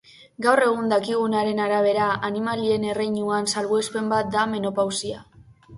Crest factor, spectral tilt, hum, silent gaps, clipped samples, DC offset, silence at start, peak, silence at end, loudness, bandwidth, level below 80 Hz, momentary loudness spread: 20 dB; -4 dB/octave; none; none; under 0.1%; under 0.1%; 0.2 s; -4 dBFS; 0 s; -23 LUFS; 11.5 kHz; -60 dBFS; 5 LU